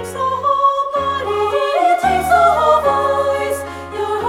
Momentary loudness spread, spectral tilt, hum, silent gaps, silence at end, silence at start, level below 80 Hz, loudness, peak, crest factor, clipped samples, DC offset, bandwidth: 9 LU; -4 dB/octave; none; none; 0 s; 0 s; -42 dBFS; -15 LUFS; -2 dBFS; 14 dB; under 0.1%; under 0.1%; 16 kHz